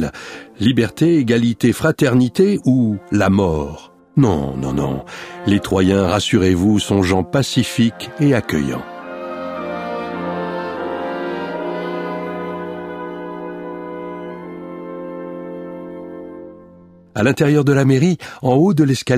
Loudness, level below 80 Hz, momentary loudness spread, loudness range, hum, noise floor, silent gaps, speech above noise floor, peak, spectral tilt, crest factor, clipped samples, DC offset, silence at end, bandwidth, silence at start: -17 LUFS; -44 dBFS; 16 LU; 13 LU; none; -44 dBFS; none; 29 dB; -2 dBFS; -6.5 dB/octave; 16 dB; under 0.1%; under 0.1%; 0 s; 15.5 kHz; 0 s